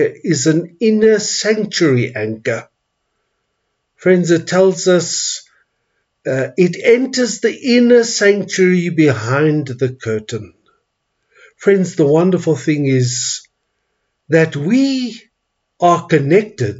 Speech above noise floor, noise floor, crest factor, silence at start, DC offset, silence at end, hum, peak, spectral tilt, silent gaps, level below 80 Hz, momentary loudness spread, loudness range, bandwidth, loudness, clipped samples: 58 dB; -71 dBFS; 14 dB; 0 s; under 0.1%; 0 s; none; 0 dBFS; -5 dB/octave; none; -64 dBFS; 9 LU; 4 LU; 8 kHz; -14 LUFS; under 0.1%